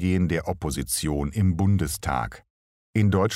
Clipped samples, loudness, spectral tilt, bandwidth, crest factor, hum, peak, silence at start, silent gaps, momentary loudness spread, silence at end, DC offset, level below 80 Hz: under 0.1%; -25 LUFS; -5.5 dB/octave; 16 kHz; 16 dB; none; -8 dBFS; 0 s; 2.50-2.93 s; 7 LU; 0 s; under 0.1%; -40 dBFS